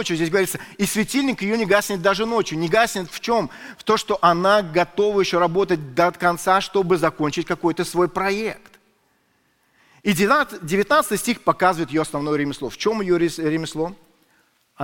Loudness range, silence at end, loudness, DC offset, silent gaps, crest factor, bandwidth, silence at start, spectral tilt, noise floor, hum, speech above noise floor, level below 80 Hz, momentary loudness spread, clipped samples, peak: 4 LU; 0 s; -20 LUFS; under 0.1%; none; 18 dB; 17 kHz; 0 s; -4.5 dB/octave; -64 dBFS; none; 44 dB; -52 dBFS; 7 LU; under 0.1%; -2 dBFS